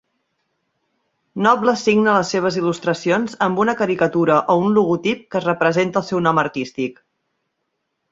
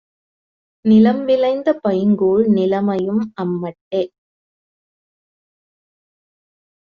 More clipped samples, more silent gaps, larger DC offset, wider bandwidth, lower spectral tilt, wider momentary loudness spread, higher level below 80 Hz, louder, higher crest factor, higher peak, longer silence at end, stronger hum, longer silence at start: neither; second, none vs 3.81-3.91 s; neither; first, 7.8 kHz vs 5.2 kHz; second, -5.5 dB/octave vs -7 dB/octave; second, 7 LU vs 11 LU; about the same, -60 dBFS vs -58 dBFS; about the same, -18 LUFS vs -17 LUFS; about the same, 18 dB vs 16 dB; about the same, -2 dBFS vs -2 dBFS; second, 1.2 s vs 2.9 s; neither; first, 1.35 s vs 0.85 s